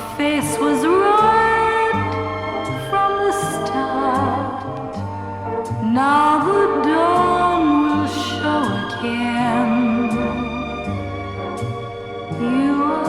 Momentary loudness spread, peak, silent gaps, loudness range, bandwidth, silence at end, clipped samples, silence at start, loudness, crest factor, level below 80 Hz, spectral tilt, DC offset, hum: 12 LU; -4 dBFS; none; 5 LU; 15.5 kHz; 0 s; under 0.1%; 0 s; -19 LUFS; 14 dB; -46 dBFS; -5.5 dB/octave; under 0.1%; none